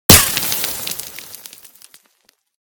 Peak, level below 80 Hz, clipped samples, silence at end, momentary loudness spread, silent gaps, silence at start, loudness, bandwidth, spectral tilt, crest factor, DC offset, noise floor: 0 dBFS; -36 dBFS; 0.6%; 1.3 s; 26 LU; none; 0.1 s; -14 LUFS; over 20 kHz; -2 dB/octave; 18 dB; under 0.1%; -60 dBFS